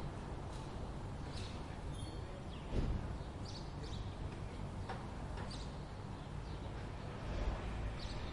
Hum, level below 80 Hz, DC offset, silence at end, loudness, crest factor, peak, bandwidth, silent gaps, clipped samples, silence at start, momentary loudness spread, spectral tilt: none; -48 dBFS; under 0.1%; 0 s; -46 LUFS; 18 dB; -26 dBFS; 11.5 kHz; none; under 0.1%; 0 s; 5 LU; -6 dB/octave